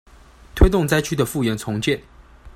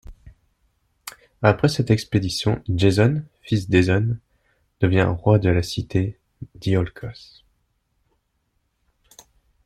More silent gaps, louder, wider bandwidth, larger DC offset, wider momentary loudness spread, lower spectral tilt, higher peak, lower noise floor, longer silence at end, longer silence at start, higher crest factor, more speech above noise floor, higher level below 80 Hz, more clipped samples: neither; about the same, -20 LUFS vs -21 LUFS; first, 16 kHz vs 14 kHz; neither; second, 8 LU vs 19 LU; about the same, -5.5 dB/octave vs -6.5 dB/octave; about the same, 0 dBFS vs -2 dBFS; second, -46 dBFS vs -71 dBFS; second, 0.05 s vs 2.55 s; first, 0.55 s vs 0.1 s; about the same, 20 dB vs 20 dB; second, 26 dB vs 51 dB; first, -26 dBFS vs -46 dBFS; neither